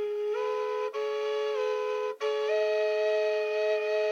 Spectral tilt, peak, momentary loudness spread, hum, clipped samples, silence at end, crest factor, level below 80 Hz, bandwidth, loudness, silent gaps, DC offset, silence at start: -0.5 dB/octave; -18 dBFS; 4 LU; none; under 0.1%; 0 s; 10 dB; under -90 dBFS; 7.2 kHz; -29 LUFS; none; under 0.1%; 0 s